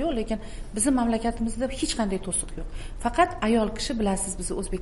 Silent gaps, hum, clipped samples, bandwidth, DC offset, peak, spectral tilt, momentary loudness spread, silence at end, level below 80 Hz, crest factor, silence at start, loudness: none; none; under 0.1%; 11.5 kHz; 0.4%; -6 dBFS; -4 dB/octave; 10 LU; 0 s; -36 dBFS; 20 dB; 0 s; -26 LUFS